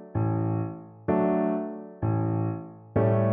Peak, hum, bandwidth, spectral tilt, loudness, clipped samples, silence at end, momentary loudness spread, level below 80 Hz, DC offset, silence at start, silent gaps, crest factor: -12 dBFS; none; 3.3 kHz; -13.5 dB/octave; -28 LUFS; under 0.1%; 0 s; 11 LU; -54 dBFS; under 0.1%; 0 s; none; 14 dB